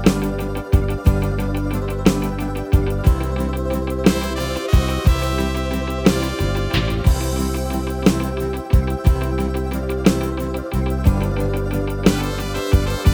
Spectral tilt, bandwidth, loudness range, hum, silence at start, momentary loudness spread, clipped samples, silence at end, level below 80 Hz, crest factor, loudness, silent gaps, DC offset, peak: -6.5 dB/octave; over 20 kHz; 1 LU; none; 0 s; 5 LU; under 0.1%; 0 s; -22 dBFS; 18 dB; -20 LUFS; none; under 0.1%; 0 dBFS